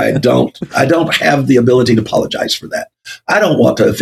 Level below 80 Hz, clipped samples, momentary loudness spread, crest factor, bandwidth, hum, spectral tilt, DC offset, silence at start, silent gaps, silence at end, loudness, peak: -48 dBFS; under 0.1%; 10 LU; 12 dB; 14.5 kHz; none; -5.5 dB/octave; under 0.1%; 0 s; none; 0 s; -12 LUFS; 0 dBFS